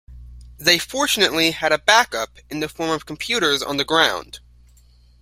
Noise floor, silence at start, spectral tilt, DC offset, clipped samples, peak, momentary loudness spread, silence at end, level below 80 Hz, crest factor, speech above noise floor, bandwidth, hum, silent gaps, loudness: -51 dBFS; 0.1 s; -2 dB/octave; under 0.1%; under 0.1%; 0 dBFS; 13 LU; 0.85 s; -48 dBFS; 20 dB; 31 dB; 16 kHz; 60 Hz at -50 dBFS; none; -18 LUFS